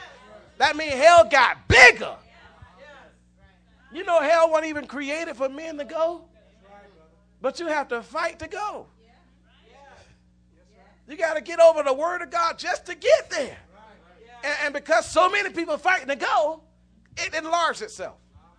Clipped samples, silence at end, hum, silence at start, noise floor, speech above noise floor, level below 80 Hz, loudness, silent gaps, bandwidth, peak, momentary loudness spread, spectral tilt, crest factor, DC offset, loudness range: under 0.1%; 0.45 s; 60 Hz at -60 dBFS; 0 s; -58 dBFS; 37 dB; -50 dBFS; -21 LUFS; none; 10 kHz; 0 dBFS; 19 LU; -3 dB/octave; 24 dB; under 0.1%; 14 LU